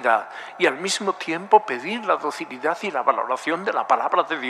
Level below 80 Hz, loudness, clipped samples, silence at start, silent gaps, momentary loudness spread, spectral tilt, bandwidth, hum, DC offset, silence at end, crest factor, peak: -82 dBFS; -22 LUFS; under 0.1%; 0 s; none; 8 LU; -3 dB/octave; 13.5 kHz; none; under 0.1%; 0 s; 20 dB; -2 dBFS